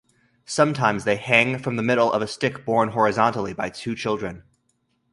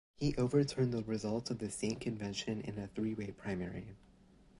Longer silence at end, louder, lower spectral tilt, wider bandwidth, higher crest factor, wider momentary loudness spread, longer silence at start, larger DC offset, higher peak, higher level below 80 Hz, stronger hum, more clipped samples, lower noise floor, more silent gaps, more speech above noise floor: about the same, 0.75 s vs 0.65 s; first, -22 LUFS vs -38 LUFS; about the same, -5 dB/octave vs -6 dB/octave; about the same, 11.5 kHz vs 11.5 kHz; about the same, 22 dB vs 18 dB; about the same, 10 LU vs 10 LU; first, 0.5 s vs 0.2 s; neither; first, 0 dBFS vs -18 dBFS; about the same, -58 dBFS vs -60 dBFS; neither; neither; first, -70 dBFS vs -63 dBFS; neither; first, 48 dB vs 26 dB